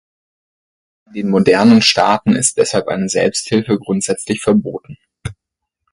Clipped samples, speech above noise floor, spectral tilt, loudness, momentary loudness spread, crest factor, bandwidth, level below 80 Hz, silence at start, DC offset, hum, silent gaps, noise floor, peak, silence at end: under 0.1%; 65 dB; -4 dB/octave; -14 LUFS; 21 LU; 16 dB; 11.5 kHz; -48 dBFS; 1.15 s; under 0.1%; none; none; -79 dBFS; 0 dBFS; 0.6 s